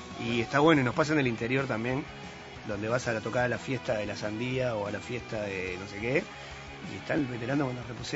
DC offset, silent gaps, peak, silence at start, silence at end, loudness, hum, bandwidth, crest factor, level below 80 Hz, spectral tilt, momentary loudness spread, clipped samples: under 0.1%; none; -8 dBFS; 0 s; 0 s; -30 LUFS; none; 8 kHz; 22 dB; -56 dBFS; -6 dB/octave; 16 LU; under 0.1%